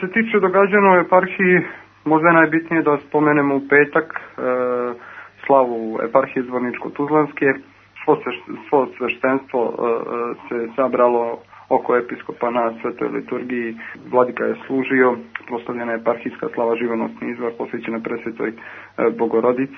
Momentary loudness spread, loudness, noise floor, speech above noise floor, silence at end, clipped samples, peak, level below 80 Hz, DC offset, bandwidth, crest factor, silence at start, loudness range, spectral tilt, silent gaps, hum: 12 LU; -19 LUFS; -39 dBFS; 20 dB; 0 s; under 0.1%; 0 dBFS; -68 dBFS; under 0.1%; 6 kHz; 18 dB; 0 s; 7 LU; -9 dB/octave; none; none